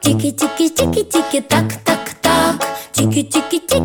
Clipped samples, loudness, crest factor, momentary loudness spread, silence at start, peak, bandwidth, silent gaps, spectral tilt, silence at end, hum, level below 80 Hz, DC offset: under 0.1%; -16 LUFS; 14 dB; 4 LU; 0 s; 0 dBFS; 19.5 kHz; none; -4 dB/octave; 0 s; none; -40 dBFS; under 0.1%